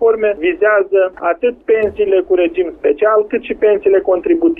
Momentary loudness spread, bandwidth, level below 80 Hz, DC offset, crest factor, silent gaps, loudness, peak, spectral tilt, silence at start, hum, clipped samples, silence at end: 4 LU; 3.8 kHz; -46 dBFS; under 0.1%; 12 dB; none; -14 LUFS; -2 dBFS; -8.5 dB/octave; 0 s; none; under 0.1%; 0 s